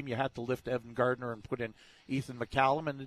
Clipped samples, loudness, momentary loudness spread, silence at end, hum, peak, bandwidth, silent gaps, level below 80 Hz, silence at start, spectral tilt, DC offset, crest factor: under 0.1%; -34 LUFS; 10 LU; 0 s; none; -14 dBFS; 14 kHz; none; -60 dBFS; 0 s; -6.5 dB/octave; under 0.1%; 20 dB